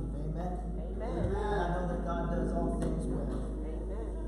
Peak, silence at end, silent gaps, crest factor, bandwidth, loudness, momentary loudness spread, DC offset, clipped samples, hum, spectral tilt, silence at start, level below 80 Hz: -20 dBFS; 0 s; none; 14 dB; 10.5 kHz; -35 LUFS; 6 LU; under 0.1%; under 0.1%; none; -8 dB/octave; 0 s; -36 dBFS